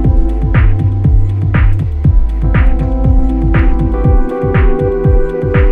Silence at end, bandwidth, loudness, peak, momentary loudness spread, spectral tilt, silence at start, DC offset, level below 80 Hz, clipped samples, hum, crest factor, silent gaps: 0 s; 3.7 kHz; -13 LUFS; 0 dBFS; 2 LU; -10.5 dB/octave; 0 s; under 0.1%; -12 dBFS; under 0.1%; none; 8 dB; none